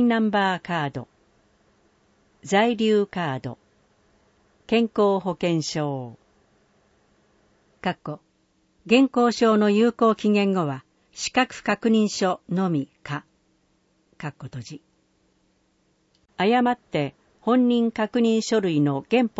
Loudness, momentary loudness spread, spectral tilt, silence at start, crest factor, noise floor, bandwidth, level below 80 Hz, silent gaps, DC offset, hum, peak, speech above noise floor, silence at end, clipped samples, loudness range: -23 LUFS; 17 LU; -5.5 dB/octave; 0 s; 20 dB; -66 dBFS; 8 kHz; -64 dBFS; none; under 0.1%; none; -4 dBFS; 44 dB; 0.1 s; under 0.1%; 10 LU